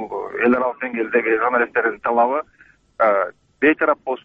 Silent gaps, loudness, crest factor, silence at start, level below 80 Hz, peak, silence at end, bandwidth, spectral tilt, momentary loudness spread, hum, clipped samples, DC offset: none; -19 LUFS; 14 dB; 0 s; -60 dBFS; -4 dBFS; 0.1 s; 4.7 kHz; -7.5 dB/octave; 7 LU; none; under 0.1%; under 0.1%